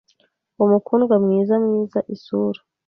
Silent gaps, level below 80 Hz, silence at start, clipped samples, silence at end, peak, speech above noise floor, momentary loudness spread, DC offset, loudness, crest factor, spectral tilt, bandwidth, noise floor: none; -66 dBFS; 0.6 s; under 0.1%; 0.35 s; -4 dBFS; 45 dB; 9 LU; under 0.1%; -19 LUFS; 16 dB; -10.5 dB/octave; 5.8 kHz; -64 dBFS